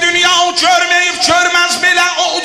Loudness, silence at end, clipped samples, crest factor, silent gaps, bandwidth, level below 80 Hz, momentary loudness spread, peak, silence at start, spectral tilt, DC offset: -9 LUFS; 0 s; under 0.1%; 12 dB; none; 15 kHz; -50 dBFS; 2 LU; 0 dBFS; 0 s; 0 dB/octave; under 0.1%